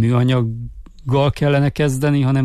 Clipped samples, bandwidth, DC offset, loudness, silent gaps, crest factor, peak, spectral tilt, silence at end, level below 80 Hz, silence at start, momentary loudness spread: under 0.1%; 13.5 kHz; under 0.1%; -17 LUFS; none; 12 dB; -6 dBFS; -7.5 dB/octave; 0 s; -38 dBFS; 0 s; 15 LU